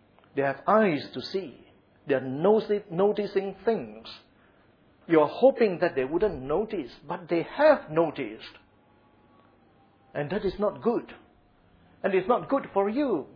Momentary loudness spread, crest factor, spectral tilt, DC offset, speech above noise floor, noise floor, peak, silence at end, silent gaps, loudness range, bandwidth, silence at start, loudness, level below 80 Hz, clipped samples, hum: 15 LU; 20 dB; -8.5 dB/octave; under 0.1%; 35 dB; -61 dBFS; -8 dBFS; 0.1 s; none; 7 LU; 5.4 kHz; 0.35 s; -26 LUFS; -58 dBFS; under 0.1%; none